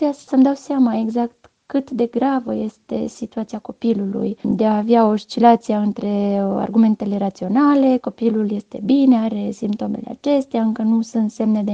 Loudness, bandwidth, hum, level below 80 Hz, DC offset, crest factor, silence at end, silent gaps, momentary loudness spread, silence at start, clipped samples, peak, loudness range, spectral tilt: -19 LUFS; 8 kHz; none; -60 dBFS; under 0.1%; 18 dB; 0 s; none; 11 LU; 0 s; under 0.1%; 0 dBFS; 5 LU; -7.5 dB/octave